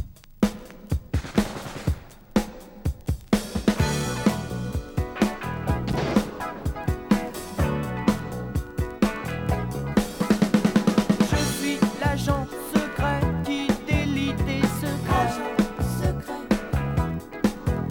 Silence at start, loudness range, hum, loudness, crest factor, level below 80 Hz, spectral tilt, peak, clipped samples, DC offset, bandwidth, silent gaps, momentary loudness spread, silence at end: 0 s; 4 LU; none; -26 LUFS; 18 dB; -36 dBFS; -6 dB/octave; -6 dBFS; under 0.1%; under 0.1%; 18.5 kHz; none; 9 LU; 0 s